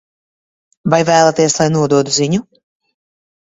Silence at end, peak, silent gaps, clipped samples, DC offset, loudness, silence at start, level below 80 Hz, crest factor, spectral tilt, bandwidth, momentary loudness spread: 1 s; 0 dBFS; none; under 0.1%; under 0.1%; -13 LUFS; 0.85 s; -52 dBFS; 16 dB; -4.5 dB/octave; 8 kHz; 8 LU